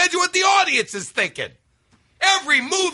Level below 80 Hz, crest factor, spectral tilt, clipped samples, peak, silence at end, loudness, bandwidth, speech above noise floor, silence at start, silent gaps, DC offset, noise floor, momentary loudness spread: -66 dBFS; 18 dB; -0.5 dB/octave; under 0.1%; -2 dBFS; 0 s; -18 LUFS; 11.5 kHz; 41 dB; 0 s; none; under 0.1%; -60 dBFS; 9 LU